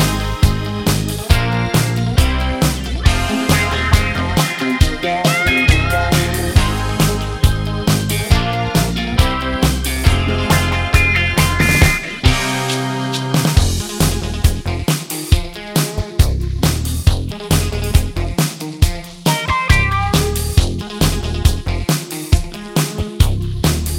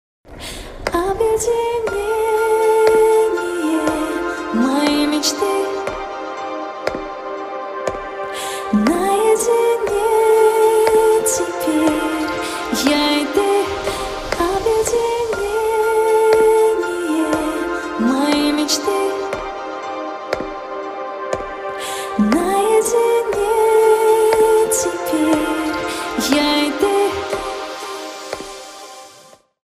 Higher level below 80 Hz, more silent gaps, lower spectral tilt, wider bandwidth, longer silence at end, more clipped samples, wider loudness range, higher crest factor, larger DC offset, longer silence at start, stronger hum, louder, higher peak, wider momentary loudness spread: first, -20 dBFS vs -44 dBFS; neither; about the same, -4.5 dB/octave vs -3.5 dB/octave; about the same, 17 kHz vs 15.5 kHz; second, 0 s vs 0.55 s; neither; second, 3 LU vs 7 LU; about the same, 16 dB vs 16 dB; neither; second, 0 s vs 0.25 s; neither; about the same, -16 LUFS vs -17 LUFS; about the same, 0 dBFS vs -2 dBFS; second, 5 LU vs 13 LU